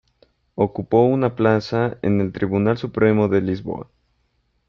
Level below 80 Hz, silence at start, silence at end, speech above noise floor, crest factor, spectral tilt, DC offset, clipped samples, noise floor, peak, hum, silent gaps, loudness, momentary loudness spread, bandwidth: -54 dBFS; 0.55 s; 0.85 s; 48 dB; 18 dB; -9 dB/octave; under 0.1%; under 0.1%; -67 dBFS; -4 dBFS; none; none; -20 LUFS; 9 LU; 6.8 kHz